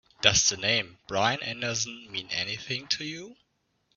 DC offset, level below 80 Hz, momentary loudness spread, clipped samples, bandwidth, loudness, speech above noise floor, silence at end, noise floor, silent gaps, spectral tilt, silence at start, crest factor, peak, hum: under 0.1%; -58 dBFS; 11 LU; under 0.1%; 7.4 kHz; -27 LUFS; 44 dB; 0.65 s; -73 dBFS; none; -1.5 dB/octave; 0.2 s; 26 dB; -4 dBFS; none